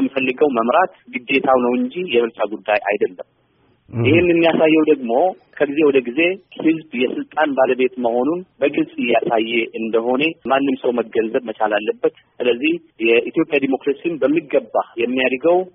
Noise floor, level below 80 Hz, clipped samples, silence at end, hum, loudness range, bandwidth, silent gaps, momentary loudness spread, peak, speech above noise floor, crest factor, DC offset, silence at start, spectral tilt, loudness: -59 dBFS; -58 dBFS; under 0.1%; 0.05 s; none; 3 LU; 4.5 kHz; none; 7 LU; -2 dBFS; 41 dB; 16 dB; under 0.1%; 0 s; -3.5 dB/octave; -18 LUFS